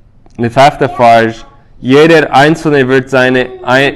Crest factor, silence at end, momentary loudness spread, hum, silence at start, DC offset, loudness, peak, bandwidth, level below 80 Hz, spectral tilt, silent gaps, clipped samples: 8 dB; 0 s; 8 LU; none; 0.4 s; under 0.1%; -8 LUFS; 0 dBFS; 13.5 kHz; -40 dBFS; -6 dB/octave; none; 2%